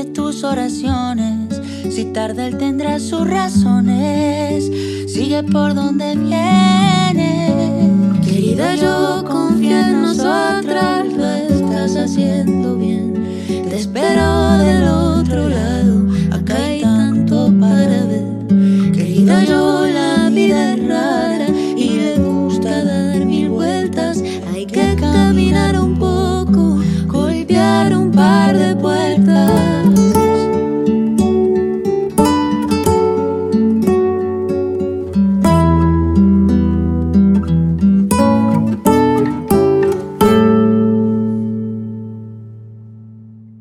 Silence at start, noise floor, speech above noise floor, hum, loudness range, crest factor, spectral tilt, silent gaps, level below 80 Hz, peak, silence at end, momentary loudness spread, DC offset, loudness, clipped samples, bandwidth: 0 s; -37 dBFS; 23 dB; none; 4 LU; 12 dB; -6.5 dB/octave; none; -32 dBFS; -2 dBFS; 0.1 s; 7 LU; under 0.1%; -14 LUFS; under 0.1%; 15.5 kHz